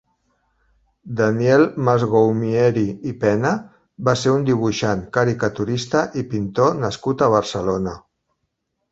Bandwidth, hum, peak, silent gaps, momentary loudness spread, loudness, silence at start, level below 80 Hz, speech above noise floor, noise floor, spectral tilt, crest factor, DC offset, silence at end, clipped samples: 8 kHz; none; -2 dBFS; none; 8 LU; -19 LUFS; 1.05 s; -50 dBFS; 56 dB; -74 dBFS; -6.5 dB/octave; 18 dB; under 0.1%; 0.9 s; under 0.1%